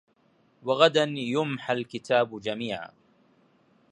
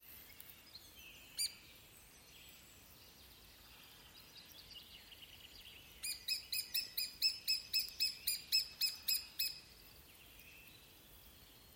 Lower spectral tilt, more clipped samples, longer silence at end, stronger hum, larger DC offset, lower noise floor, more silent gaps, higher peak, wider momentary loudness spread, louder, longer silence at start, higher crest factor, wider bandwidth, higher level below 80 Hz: first, -5 dB/octave vs 1 dB/octave; neither; first, 1.05 s vs 0 s; neither; neither; first, -65 dBFS vs -61 dBFS; neither; first, -4 dBFS vs -22 dBFS; second, 14 LU vs 23 LU; first, -26 LUFS vs -38 LUFS; first, 0.65 s vs 0.05 s; about the same, 24 dB vs 24 dB; second, 10.5 kHz vs 17 kHz; about the same, -72 dBFS vs -72 dBFS